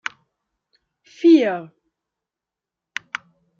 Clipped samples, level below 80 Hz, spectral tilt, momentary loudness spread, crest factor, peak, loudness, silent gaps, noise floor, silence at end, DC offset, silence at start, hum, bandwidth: under 0.1%; -80 dBFS; -5 dB/octave; 19 LU; 20 dB; -4 dBFS; -18 LUFS; none; -87 dBFS; 1.95 s; under 0.1%; 1.2 s; none; 7 kHz